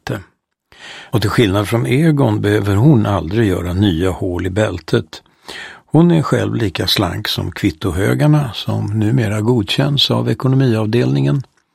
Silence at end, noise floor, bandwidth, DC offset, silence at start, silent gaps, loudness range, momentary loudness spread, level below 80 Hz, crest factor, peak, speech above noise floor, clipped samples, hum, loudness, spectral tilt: 0.3 s; -53 dBFS; 15.5 kHz; under 0.1%; 0.05 s; none; 2 LU; 9 LU; -40 dBFS; 16 dB; 0 dBFS; 39 dB; under 0.1%; none; -15 LUFS; -6.5 dB/octave